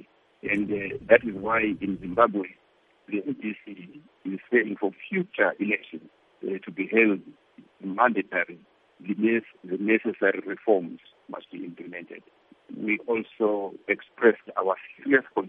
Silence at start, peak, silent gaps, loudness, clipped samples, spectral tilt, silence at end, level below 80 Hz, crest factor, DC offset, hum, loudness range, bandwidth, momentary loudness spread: 0.45 s; -4 dBFS; none; -26 LUFS; under 0.1%; -8.5 dB/octave; 0 s; -66 dBFS; 24 dB; under 0.1%; none; 4 LU; 3.9 kHz; 18 LU